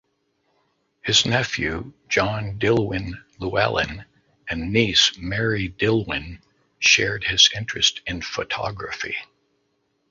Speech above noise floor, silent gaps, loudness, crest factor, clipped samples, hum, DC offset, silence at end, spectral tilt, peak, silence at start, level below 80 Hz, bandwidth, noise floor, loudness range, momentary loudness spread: 48 dB; none; -21 LUFS; 22 dB; under 0.1%; none; under 0.1%; 0.85 s; -3 dB/octave; -2 dBFS; 1.05 s; -46 dBFS; 7.8 kHz; -70 dBFS; 4 LU; 15 LU